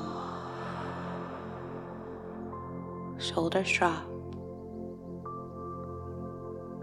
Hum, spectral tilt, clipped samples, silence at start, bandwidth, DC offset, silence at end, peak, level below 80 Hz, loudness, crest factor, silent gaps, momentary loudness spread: none; -5 dB/octave; under 0.1%; 0 s; 12.5 kHz; under 0.1%; 0 s; -12 dBFS; -60 dBFS; -36 LUFS; 24 dB; none; 14 LU